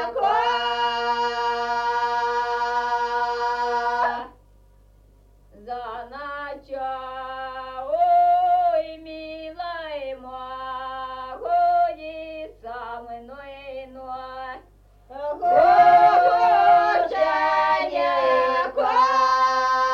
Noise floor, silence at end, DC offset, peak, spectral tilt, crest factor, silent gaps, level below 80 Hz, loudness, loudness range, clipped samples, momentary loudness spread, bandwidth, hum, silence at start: -53 dBFS; 0 s; under 0.1%; -6 dBFS; -3 dB/octave; 16 dB; none; -54 dBFS; -21 LUFS; 14 LU; under 0.1%; 19 LU; 7.2 kHz; 50 Hz at -55 dBFS; 0 s